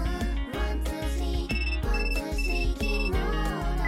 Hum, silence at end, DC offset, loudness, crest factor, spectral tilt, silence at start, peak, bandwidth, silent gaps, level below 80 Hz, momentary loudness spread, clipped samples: none; 0 s; under 0.1%; -29 LUFS; 10 dB; -5.5 dB/octave; 0 s; -16 dBFS; 15 kHz; none; -28 dBFS; 3 LU; under 0.1%